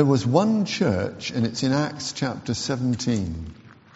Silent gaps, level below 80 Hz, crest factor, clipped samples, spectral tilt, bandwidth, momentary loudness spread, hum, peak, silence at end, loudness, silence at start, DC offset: none; -48 dBFS; 20 dB; under 0.1%; -6 dB/octave; 8 kHz; 8 LU; none; -4 dBFS; 0.25 s; -24 LUFS; 0 s; under 0.1%